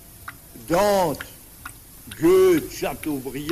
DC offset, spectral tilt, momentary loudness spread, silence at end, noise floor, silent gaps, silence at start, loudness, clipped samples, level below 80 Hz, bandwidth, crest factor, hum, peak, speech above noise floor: under 0.1%; -5 dB/octave; 23 LU; 0 s; -42 dBFS; none; 0.2 s; -21 LUFS; under 0.1%; -48 dBFS; 15.5 kHz; 14 dB; none; -8 dBFS; 22 dB